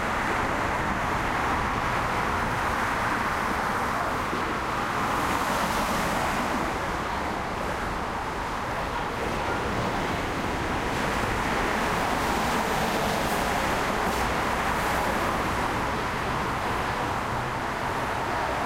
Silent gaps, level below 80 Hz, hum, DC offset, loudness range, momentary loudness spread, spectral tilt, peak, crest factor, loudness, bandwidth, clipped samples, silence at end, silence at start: none; -40 dBFS; none; under 0.1%; 3 LU; 4 LU; -4.5 dB/octave; -12 dBFS; 14 dB; -27 LUFS; 16 kHz; under 0.1%; 0 s; 0 s